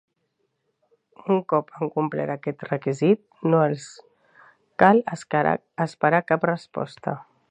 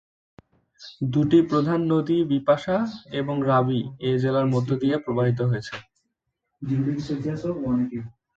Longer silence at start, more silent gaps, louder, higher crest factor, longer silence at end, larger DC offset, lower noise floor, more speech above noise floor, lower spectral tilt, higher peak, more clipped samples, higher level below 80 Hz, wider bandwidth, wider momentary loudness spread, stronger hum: first, 1.25 s vs 0.8 s; neither; about the same, -23 LUFS vs -24 LUFS; first, 24 dB vs 18 dB; about the same, 0.3 s vs 0.25 s; neither; second, -74 dBFS vs -79 dBFS; second, 51 dB vs 56 dB; about the same, -7.5 dB/octave vs -8.5 dB/octave; first, 0 dBFS vs -6 dBFS; neither; second, -68 dBFS vs -56 dBFS; first, 9.8 kHz vs 7.8 kHz; first, 13 LU vs 10 LU; neither